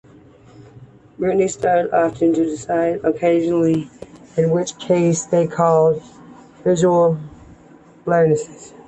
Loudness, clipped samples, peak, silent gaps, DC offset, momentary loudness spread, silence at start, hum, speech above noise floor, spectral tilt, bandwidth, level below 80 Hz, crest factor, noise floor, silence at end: -18 LUFS; under 0.1%; -4 dBFS; none; under 0.1%; 10 LU; 0.6 s; none; 29 dB; -6.5 dB/octave; 8.6 kHz; -54 dBFS; 16 dB; -46 dBFS; 0.2 s